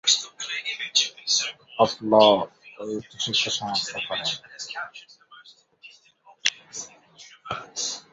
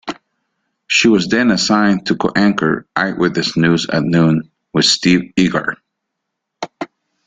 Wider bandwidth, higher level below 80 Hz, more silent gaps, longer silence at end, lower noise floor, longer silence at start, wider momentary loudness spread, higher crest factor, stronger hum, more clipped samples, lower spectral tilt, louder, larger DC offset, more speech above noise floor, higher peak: second, 8 kHz vs 9.4 kHz; second, -68 dBFS vs -50 dBFS; neither; second, 0.1 s vs 0.4 s; second, -56 dBFS vs -76 dBFS; about the same, 0.05 s vs 0.05 s; about the same, 18 LU vs 17 LU; first, 24 dB vs 16 dB; neither; neither; second, -1.5 dB/octave vs -4.5 dB/octave; second, -24 LUFS vs -14 LUFS; neither; second, 32 dB vs 62 dB; about the same, -2 dBFS vs 0 dBFS